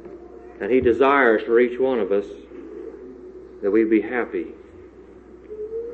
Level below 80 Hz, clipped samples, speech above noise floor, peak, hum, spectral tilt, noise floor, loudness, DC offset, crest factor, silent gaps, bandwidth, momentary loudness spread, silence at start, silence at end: -52 dBFS; under 0.1%; 25 dB; -4 dBFS; none; -7.5 dB/octave; -44 dBFS; -20 LUFS; under 0.1%; 18 dB; none; 4.5 kHz; 23 LU; 0 s; 0 s